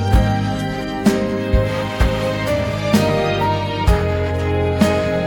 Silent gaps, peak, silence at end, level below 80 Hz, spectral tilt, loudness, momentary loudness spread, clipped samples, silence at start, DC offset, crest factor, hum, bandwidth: none; 0 dBFS; 0 s; -24 dBFS; -6.5 dB/octave; -18 LUFS; 4 LU; under 0.1%; 0 s; under 0.1%; 16 dB; none; 18 kHz